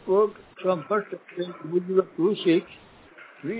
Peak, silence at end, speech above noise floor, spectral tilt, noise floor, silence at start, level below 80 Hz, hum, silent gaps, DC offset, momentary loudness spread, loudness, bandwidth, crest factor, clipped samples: -8 dBFS; 0 s; 24 dB; -10.5 dB/octave; -49 dBFS; 0.05 s; -70 dBFS; none; none; under 0.1%; 12 LU; -26 LUFS; 4 kHz; 18 dB; under 0.1%